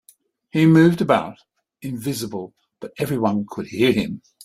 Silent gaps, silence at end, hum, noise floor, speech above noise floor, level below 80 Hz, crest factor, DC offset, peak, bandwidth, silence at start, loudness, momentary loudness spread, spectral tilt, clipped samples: none; 0.25 s; none; -56 dBFS; 37 dB; -56 dBFS; 18 dB; under 0.1%; -2 dBFS; 15 kHz; 0.55 s; -20 LUFS; 21 LU; -6.5 dB/octave; under 0.1%